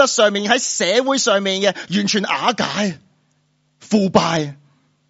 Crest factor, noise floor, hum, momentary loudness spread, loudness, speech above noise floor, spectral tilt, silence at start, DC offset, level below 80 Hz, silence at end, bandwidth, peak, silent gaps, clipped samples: 18 dB; -63 dBFS; none; 7 LU; -17 LUFS; 45 dB; -3.5 dB/octave; 0 s; under 0.1%; -60 dBFS; 0.55 s; 8 kHz; 0 dBFS; none; under 0.1%